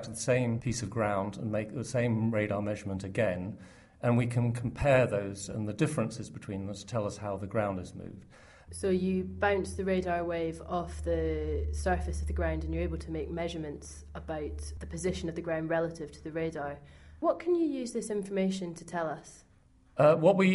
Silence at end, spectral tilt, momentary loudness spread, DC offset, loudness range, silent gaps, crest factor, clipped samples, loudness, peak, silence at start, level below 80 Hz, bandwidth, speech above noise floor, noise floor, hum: 0 s; -6.5 dB/octave; 12 LU; under 0.1%; 5 LU; none; 20 dB; under 0.1%; -32 LUFS; -12 dBFS; 0 s; -44 dBFS; 11.5 kHz; 31 dB; -62 dBFS; none